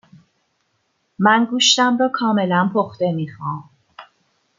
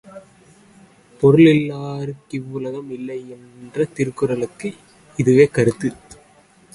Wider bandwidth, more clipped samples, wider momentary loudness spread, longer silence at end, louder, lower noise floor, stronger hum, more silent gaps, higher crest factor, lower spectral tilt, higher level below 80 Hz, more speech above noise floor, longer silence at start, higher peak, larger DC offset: second, 9.6 kHz vs 11.5 kHz; neither; second, 14 LU vs 18 LU; second, 0.55 s vs 0.8 s; about the same, -17 LUFS vs -18 LUFS; first, -68 dBFS vs -52 dBFS; neither; neither; about the same, 18 dB vs 20 dB; second, -3.5 dB/octave vs -7.5 dB/octave; second, -68 dBFS vs -54 dBFS; first, 50 dB vs 34 dB; first, 1.2 s vs 0.05 s; about the same, -2 dBFS vs 0 dBFS; neither